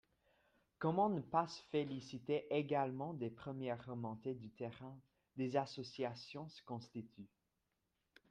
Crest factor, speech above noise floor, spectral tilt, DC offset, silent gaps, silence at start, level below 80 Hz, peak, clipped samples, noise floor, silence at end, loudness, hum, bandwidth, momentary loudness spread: 22 dB; 45 dB; -7 dB/octave; under 0.1%; none; 0.8 s; -80 dBFS; -22 dBFS; under 0.1%; -87 dBFS; 1.05 s; -43 LUFS; none; 9.6 kHz; 16 LU